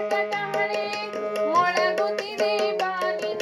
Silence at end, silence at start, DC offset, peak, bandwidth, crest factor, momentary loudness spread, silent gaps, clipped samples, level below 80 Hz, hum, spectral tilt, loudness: 0 s; 0 s; under 0.1%; -10 dBFS; 12.5 kHz; 16 dB; 6 LU; none; under 0.1%; -80 dBFS; none; -3 dB/octave; -24 LUFS